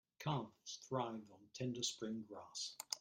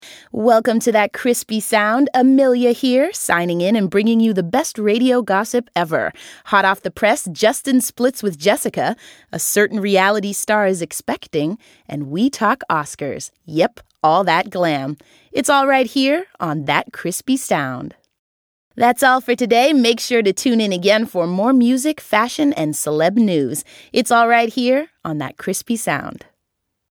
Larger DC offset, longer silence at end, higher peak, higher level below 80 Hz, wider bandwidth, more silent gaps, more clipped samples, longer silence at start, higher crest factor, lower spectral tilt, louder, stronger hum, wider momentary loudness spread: neither; second, 0 s vs 0.8 s; second, -22 dBFS vs 0 dBFS; second, -82 dBFS vs -62 dBFS; second, 16 kHz vs 19 kHz; second, none vs 18.19-18.71 s; neither; first, 0.2 s vs 0.05 s; first, 24 dB vs 18 dB; about the same, -4 dB/octave vs -4 dB/octave; second, -45 LUFS vs -17 LUFS; neither; about the same, 10 LU vs 11 LU